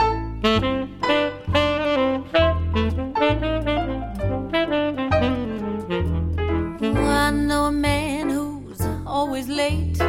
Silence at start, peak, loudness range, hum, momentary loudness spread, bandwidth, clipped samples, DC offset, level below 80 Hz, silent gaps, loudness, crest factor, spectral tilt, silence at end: 0 s; -4 dBFS; 2 LU; none; 7 LU; 16.5 kHz; under 0.1%; under 0.1%; -32 dBFS; none; -22 LUFS; 18 dB; -6 dB/octave; 0 s